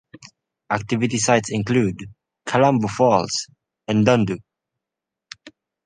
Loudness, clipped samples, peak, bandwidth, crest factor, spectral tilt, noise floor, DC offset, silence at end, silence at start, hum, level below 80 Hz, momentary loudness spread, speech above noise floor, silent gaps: -20 LUFS; under 0.1%; -2 dBFS; 10 kHz; 20 dB; -5 dB/octave; -85 dBFS; under 0.1%; 0.35 s; 0.7 s; none; -54 dBFS; 21 LU; 67 dB; none